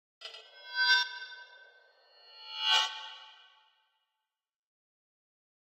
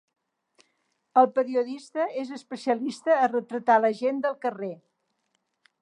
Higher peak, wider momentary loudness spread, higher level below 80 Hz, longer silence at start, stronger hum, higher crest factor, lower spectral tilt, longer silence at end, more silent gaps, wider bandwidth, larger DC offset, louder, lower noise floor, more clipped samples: second, -12 dBFS vs -6 dBFS; first, 23 LU vs 13 LU; about the same, under -90 dBFS vs -86 dBFS; second, 0.2 s vs 1.15 s; neither; about the same, 24 dB vs 20 dB; second, 7.5 dB/octave vs -5.5 dB/octave; first, 2.45 s vs 1.05 s; neither; first, 16 kHz vs 11 kHz; neither; second, -28 LUFS vs -25 LUFS; first, -88 dBFS vs -76 dBFS; neither